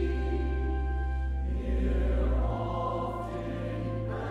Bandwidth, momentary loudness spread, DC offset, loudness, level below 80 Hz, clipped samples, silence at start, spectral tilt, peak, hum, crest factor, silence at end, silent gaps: 4.7 kHz; 5 LU; under 0.1%; -32 LUFS; -32 dBFS; under 0.1%; 0 s; -9 dB/octave; -18 dBFS; none; 12 dB; 0 s; none